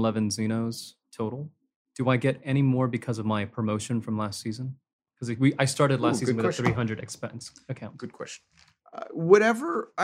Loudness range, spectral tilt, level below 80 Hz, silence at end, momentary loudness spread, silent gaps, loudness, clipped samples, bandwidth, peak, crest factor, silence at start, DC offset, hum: 2 LU; -6 dB/octave; -62 dBFS; 0 s; 17 LU; 1.76-1.85 s, 4.93-4.99 s; -26 LUFS; under 0.1%; 15 kHz; -6 dBFS; 22 dB; 0 s; under 0.1%; none